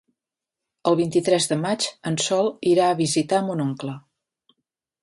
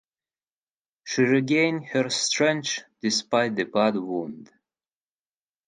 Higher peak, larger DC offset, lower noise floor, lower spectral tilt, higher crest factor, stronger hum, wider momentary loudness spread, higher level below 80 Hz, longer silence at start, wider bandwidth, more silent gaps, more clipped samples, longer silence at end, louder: about the same, -6 dBFS vs -8 dBFS; neither; about the same, -87 dBFS vs under -90 dBFS; about the same, -4.5 dB/octave vs -3.5 dB/octave; about the same, 18 dB vs 18 dB; neither; about the same, 8 LU vs 10 LU; first, -66 dBFS vs -74 dBFS; second, 0.85 s vs 1.05 s; about the same, 11.5 kHz vs 11 kHz; neither; neither; second, 1.05 s vs 1.25 s; about the same, -22 LUFS vs -24 LUFS